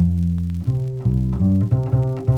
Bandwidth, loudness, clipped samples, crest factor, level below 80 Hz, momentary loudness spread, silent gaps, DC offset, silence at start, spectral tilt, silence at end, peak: 3.9 kHz; -20 LUFS; under 0.1%; 14 dB; -32 dBFS; 4 LU; none; under 0.1%; 0 s; -11 dB/octave; 0 s; -6 dBFS